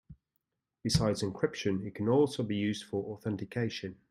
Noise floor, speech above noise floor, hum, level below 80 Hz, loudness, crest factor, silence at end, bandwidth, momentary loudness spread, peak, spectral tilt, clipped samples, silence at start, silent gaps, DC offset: -83 dBFS; 51 dB; none; -56 dBFS; -32 LUFS; 20 dB; 0.15 s; 15 kHz; 9 LU; -12 dBFS; -5.5 dB/octave; under 0.1%; 0.1 s; none; under 0.1%